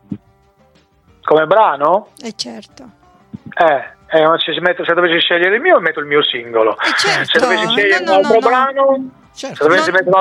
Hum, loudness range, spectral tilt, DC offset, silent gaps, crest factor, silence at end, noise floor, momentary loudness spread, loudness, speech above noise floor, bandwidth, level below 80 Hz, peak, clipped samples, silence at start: none; 4 LU; -3.5 dB/octave; under 0.1%; none; 14 dB; 0 s; -52 dBFS; 14 LU; -13 LUFS; 39 dB; 12.5 kHz; -60 dBFS; 0 dBFS; under 0.1%; 0.1 s